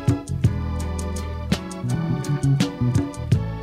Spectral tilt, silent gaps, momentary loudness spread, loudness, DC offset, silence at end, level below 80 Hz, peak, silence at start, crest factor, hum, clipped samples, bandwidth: -6.5 dB/octave; none; 6 LU; -24 LUFS; under 0.1%; 0 s; -34 dBFS; -6 dBFS; 0 s; 18 dB; none; under 0.1%; 14.5 kHz